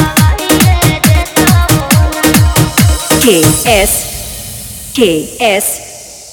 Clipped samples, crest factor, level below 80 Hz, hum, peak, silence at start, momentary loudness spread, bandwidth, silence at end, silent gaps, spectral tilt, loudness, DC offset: 0.6%; 10 dB; -20 dBFS; none; 0 dBFS; 0 s; 13 LU; over 20 kHz; 0 s; none; -4 dB/octave; -9 LUFS; under 0.1%